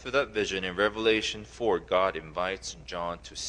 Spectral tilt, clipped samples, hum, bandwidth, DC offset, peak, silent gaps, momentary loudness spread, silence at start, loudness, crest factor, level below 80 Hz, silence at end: -3.5 dB/octave; under 0.1%; none; 10.5 kHz; under 0.1%; -10 dBFS; none; 10 LU; 0 s; -29 LUFS; 20 dB; -52 dBFS; 0 s